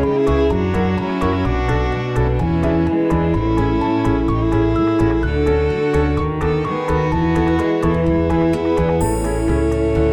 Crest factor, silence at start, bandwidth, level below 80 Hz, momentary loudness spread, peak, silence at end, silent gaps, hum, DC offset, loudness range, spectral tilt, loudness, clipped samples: 12 dB; 0 s; 17 kHz; -24 dBFS; 3 LU; -4 dBFS; 0 s; none; none; under 0.1%; 1 LU; -7.5 dB/octave; -18 LUFS; under 0.1%